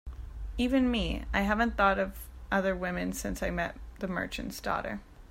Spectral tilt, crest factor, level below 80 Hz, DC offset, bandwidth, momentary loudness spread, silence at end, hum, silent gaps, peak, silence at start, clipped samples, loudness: -5 dB/octave; 20 dB; -42 dBFS; under 0.1%; 16 kHz; 13 LU; 0.05 s; none; none; -12 dBFS; 0.05 s; under 0.1%; -31 LUFS